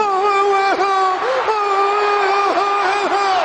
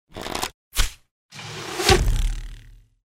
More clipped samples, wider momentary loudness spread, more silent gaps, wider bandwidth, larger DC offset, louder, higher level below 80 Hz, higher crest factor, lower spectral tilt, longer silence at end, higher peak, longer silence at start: neither; second, 2 LU vs 20 LU; second, none vs 0.54-0.71 s, 1.11-1.29 s; second, 9.6 kHz vs 16.5 kHz; neither; first, -16 LUFS vs -24 LUFS; second, -60 dBFS vs -28 dBFS; second, 12 dB vs 22 dB; second, -2 dB/octave vs -3.5 dB/octave; second, 0 s vs 0.35 s; about the same, -4 dBFS vs -4 dBFS; second, 0 s vs 0.15 s